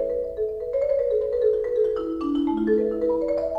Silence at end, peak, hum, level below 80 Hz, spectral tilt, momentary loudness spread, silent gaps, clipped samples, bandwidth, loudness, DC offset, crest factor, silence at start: 0 s; -10 dBFS; none; -48 dBFS; -8 dB/octave; 5 LU; none; under 0.1%; 5.4 kHz; -24 LUFS; under 0.1%; 12 dB; 0 s